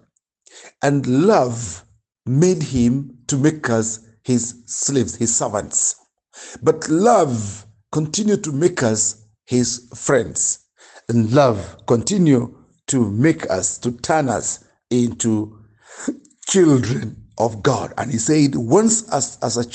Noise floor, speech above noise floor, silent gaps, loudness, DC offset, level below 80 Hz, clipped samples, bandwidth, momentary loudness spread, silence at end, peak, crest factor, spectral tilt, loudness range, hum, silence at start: -58 dBFS; 40 dB; none; -18 LUFS; under 0.1%; -52 dBFS; under 0.1%; 9.4 kHz; 14 LU; 0 s; -2 dBFS; 18 dB; -5 dB/octave; 2 LU; none; 0.55 s